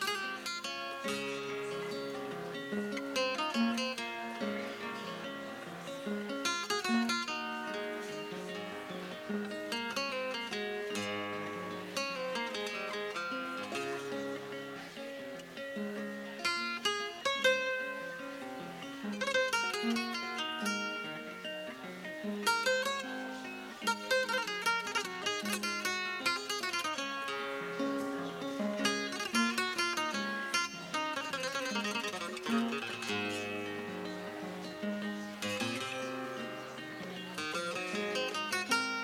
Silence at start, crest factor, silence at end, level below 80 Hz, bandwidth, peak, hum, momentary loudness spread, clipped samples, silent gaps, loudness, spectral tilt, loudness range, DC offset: 0 s; 20 dB; 0 s; -76 dBFS; 17 kHz; -16 dBFS; none; 10 LU; under 0.1%; none; -36 LUFS; -3 dB/octave; 5 LU; under 0.1%